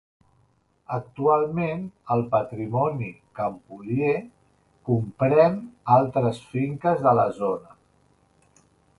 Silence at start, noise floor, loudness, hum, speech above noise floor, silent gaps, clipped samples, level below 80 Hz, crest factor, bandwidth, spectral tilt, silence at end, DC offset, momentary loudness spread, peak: 0.9 s; -65 dBFS; -24 LUFS; none; 41 dB; none; under 0.1%; -60 dBFS; 20 dB; 11.5 kHz; -9 dB/octave; 1.4 s; under 0.1%; 13 LU; -4 dBFS